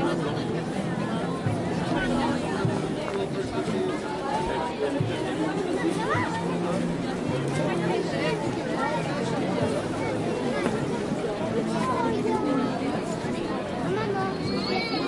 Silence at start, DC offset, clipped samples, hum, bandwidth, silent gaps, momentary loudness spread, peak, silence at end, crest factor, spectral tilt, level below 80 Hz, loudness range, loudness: 0 s; under 0.1%; under 0.1%; none; 11.5 kHz; none; 3 LU; -10 dBFS; 0 s; 18 dB; -6 dB/octave; -52 dBFS; 1 LU; -27 LUFS